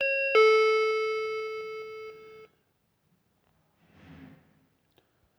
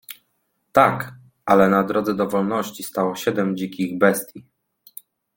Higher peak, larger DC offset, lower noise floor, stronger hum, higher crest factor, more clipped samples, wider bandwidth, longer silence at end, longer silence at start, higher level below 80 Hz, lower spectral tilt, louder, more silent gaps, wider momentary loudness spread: second, -12 dBFS vs -2 dBFS; neither; about the same, -73 dBFS vs -71 dBFS; neither; about the same, 18 dB vs 20 dB; neither; second, 8.8 kHz vs 17 kHz; first, 1.1 s vs 0.95 s; about the same, 0 s vs 0.1 s; second, -76 dBFS vs -58 dBFS; second, -2 dB/octave vs -5.5 dB/octave; second, -25 LUFS vs -20 LUFS; neither; about the same, 21 LU vs 22 LU